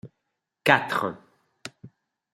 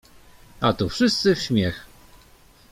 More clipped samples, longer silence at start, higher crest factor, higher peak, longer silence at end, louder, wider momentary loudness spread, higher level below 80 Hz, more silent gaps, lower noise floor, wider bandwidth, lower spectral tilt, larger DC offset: neither; second, 0.05 s vs 0.6 s; first, 28 dB vs 18 dB; first, -2 dBFS vs -6 dBFS; second, 0.45 s vs 0.9 s; about the same, -23 LUFS vs -22 LUFS; first, 22 LU vs 7 LU; second, -70 dBFS vs -48 dBFS; neither; first, -81 dBFS vs -52 dBFS; about the same, 16 kHz vs 16 kHz; about the same, -4.5 dB/octave vs -5 dB/octave; neither